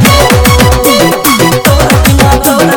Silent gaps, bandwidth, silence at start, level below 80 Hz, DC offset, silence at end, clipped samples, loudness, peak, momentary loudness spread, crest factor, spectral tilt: none; over 20 kHz; 0 s; -14 dBFS; under 0.1%; 0 s; 2%; -6 LUFS; 0 dBFS; 2 LU; 6 dB; -4.5 dB/octave